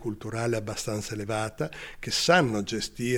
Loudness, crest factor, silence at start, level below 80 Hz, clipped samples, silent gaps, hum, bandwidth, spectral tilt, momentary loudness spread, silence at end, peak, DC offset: -28 LUFS; 20 dB; 0 s; -52 dBFS; under 0.1%; none; none; 17.5 kHz; -4 dB/octave; 12 LU; 0 s; -8 dBFS; under 0.1%